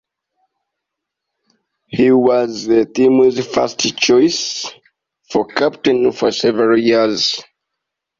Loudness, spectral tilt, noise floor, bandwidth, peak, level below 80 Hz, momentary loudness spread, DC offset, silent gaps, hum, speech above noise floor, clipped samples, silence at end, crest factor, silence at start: -15 LUFS; -4 dB/octave; -80 dBFS; 7.6 kHz; -2 dBFS; -58 dBFS; 9 LU; under 0.1%; none; none; 66 dB; under 0.1%; 0.8 s; 14 dB; 1.9 s